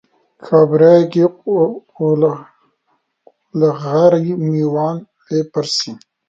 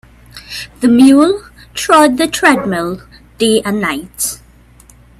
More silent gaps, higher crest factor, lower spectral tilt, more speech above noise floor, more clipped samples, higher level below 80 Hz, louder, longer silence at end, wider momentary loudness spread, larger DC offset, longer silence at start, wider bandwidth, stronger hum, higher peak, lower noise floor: neither; about the same, 16 dB vs 14 dB; first, -6.5 dB/octave vs -3.5 dB/octave; first, 51 dB vs 32 dB; neither; second, -64 dBFS vs -44 dBFS; second, -15 LUFS vs -12 LUFS; second, 0.35 s vs 0.85 s; second, 12 LU vs 18 LU; neither; about the same, 0.45 s vs 0.35 s; second, 7.8 kHz vs 14.5 kHz; second, none vs 60 Hz at -40 dBFS; about the same, 0 dBFS vs 0 dBFS; first, -66 dBFS vs -43 dBFS